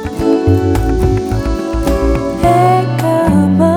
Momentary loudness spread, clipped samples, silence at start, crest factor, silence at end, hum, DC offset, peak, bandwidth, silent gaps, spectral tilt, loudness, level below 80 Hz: 6 LU; under 0.1%; 0 s; 12 dB; 0 s; none; under 0.1%; 0 dBFS; 18.5 kHz; none; -7.5 dB/octave; -13 LUFS; -22 dBFS